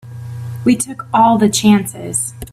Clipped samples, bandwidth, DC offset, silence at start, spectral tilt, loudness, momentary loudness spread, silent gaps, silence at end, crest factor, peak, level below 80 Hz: under 0.1%; 15.5 kHz; under 0.1%; 0.05 s; -4.5 dB/octave; -14 LUFS; 15 LU; none; 0.05 s; 14 dB; 0 dBFS; -46 dBFS